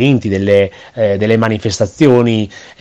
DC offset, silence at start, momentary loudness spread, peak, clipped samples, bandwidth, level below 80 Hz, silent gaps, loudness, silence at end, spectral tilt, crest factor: under 0.1%; 0 s; 8 LU; 0 dBFS; 0.3%; 9 kHz; -48 dBFS; none; -13 LUFS; 0.2 s; -6.5 dB/octave; 12 dB